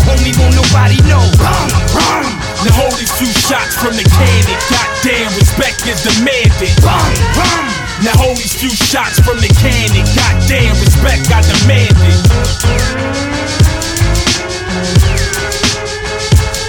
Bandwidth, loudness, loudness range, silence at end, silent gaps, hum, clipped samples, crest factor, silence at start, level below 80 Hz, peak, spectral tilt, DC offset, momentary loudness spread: 18.5 kHz; -10 LUFS; 3 LU; 0 s; none; none; 0.4%; 10 dB; 0 s; -16 dBFS; 0 dBFS; -4.5 dB/octave; under 0.1%; 6 LU